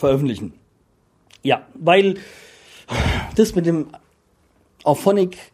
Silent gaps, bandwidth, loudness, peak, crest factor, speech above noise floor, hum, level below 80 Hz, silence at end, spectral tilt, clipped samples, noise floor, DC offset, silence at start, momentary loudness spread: none; 15.5 kHz; -19 LUFS; -2 dBFS; 18 dB; 42 dB; none; -38 dBFS; 0.1 s; -6 dB/octave; under 0.1%; -61 dBFS; under 0.1%; 0 s; 15 LU